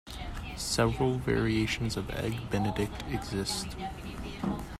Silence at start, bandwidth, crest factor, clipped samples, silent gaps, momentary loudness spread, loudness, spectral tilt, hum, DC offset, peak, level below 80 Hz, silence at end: 0.05 s; 15.5 kHz; 18 dB; under 0.1%; none; 12 LU; -32 LUFS; -5 dB/octave; none; under 0.1%; -14 dBFS; -44 dBFS; 0.05 s